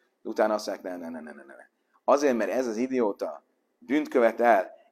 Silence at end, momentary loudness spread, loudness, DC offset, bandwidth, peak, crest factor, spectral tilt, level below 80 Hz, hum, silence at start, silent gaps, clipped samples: 0.2 s; 15 LU; -26 LUFS; under 0.1%; 14.5 kHz; -6 dBFS; 20 dB; -4.5 dB/octave; -80 dBFS; none; 0.25 s; none; under 0.1%